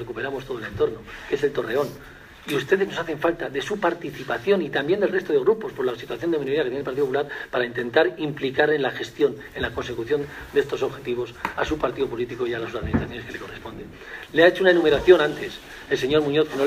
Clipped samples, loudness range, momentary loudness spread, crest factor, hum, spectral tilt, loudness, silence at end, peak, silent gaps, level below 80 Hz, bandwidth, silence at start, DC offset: under 0.1%; 6 LU; 14 LU; 22 dB; none; -5.5 dB/octave; -23 LUFS; 0 s; -2 dBFS; none; -48 dBFS; 15.5 kHz; 0 s; under 0.1%